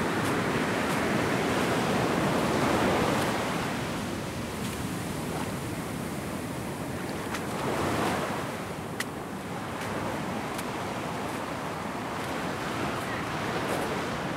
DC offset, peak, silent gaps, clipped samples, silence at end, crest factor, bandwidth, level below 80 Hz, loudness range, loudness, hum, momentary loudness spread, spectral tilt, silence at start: under 0.1%; -14 dBFS; none; under 0.1%; 0 s; 16 dB; 16 kHz; -52 dBFS; 7 LU; -30 LUFS; none; 8 LU; -5 dB/octave; 0 s